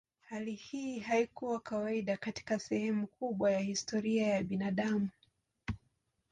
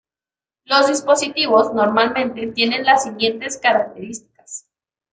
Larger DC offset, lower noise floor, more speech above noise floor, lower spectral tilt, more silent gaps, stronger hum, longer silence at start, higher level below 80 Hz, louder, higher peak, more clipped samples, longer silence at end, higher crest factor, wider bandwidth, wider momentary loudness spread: neither; second, -78 dBFS vs under -90 dBFS; second, 43 dB vs over 73 dB; first, -5.5 dB/octave vs -2.5 dB/octave; neither; neither; second, 0.3 s vs 0.7 s; about the same, -62 dBFS vs -62 dBFS; second, -35 LUFS vs -17 LUFS; second, -20 dBFS vs -2 dBFS; neither; about the same, 0.55 s vs 0.55 s; about the same, 16 dB vs 18 dB; about the same, 9.4 kHz vs 9.6 kHz; second, 11 LU vs 19 LU